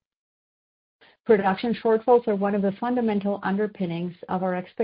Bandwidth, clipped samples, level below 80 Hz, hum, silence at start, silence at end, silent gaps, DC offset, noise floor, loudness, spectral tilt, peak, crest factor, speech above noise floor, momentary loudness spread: 5.2 kHz; under 0.1%; -64 dBFS; none; 1.25 s; 0 s; none; under 0.1%; under -90 dBFS; -24 LUFS; -11.5 dB/octave; -6 dBFS; 20 dB; over 67 dB; 9 LU